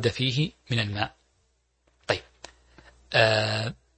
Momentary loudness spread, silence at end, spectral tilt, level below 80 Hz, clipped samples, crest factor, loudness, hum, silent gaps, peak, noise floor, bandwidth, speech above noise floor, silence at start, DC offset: 10 LU; 0.25 s; -5 dB/octave; -56 dBFS; under 0.1%; 24 dB; -26 LUFS; none; none; -4 dBFS; -70 dBFS; 8.8 kHz; 45 dB; 0 s; under 0.1%